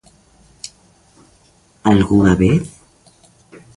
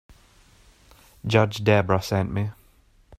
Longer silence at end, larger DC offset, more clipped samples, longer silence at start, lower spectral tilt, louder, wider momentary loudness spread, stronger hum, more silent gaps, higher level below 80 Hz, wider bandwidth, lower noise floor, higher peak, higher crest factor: first, 1.1 s vs 0.05 s; neither; neither; first, 1.85 s vs 1.25 s; about the same, -7 dB/octave vs -6.5 dB/octave; first, -14 LUFS vs -23 LUFS; first, 22 LU vs 11 LU; neither; neither; first, -38 dBFS vs -52 dBFS; second, 11.5 kHz vs 15 kHz; second, -53 dBFS vs -57 dBFS; about the same, 0 dBFS vs -2 dBFS; second, 18 dB vs 24 dB